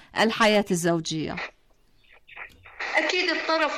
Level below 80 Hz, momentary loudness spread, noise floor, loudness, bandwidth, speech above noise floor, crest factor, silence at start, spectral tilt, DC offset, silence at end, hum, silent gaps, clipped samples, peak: -58 dBFS; 21 LU; -60 dBFS; -24 LUFS; 15.5 kHz; 36 dB; 16 dB; 0.15 s; -4 dB/octave; under 0.1%; 0 s; none; none; under 0.1%; -10 dBFS